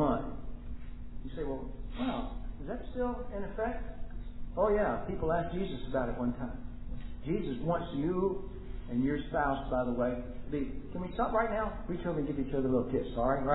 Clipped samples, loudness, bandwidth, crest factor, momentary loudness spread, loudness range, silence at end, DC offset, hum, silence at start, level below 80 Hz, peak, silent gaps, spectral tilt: under 0.1%; -34 LUFS; 3.9 kHz; 20 dB; 15 LU; 5 LU; 0 s; under 0.1%; none; 0 s; -42 dBFS; -14 dBFS; none; -4.5 dB/octave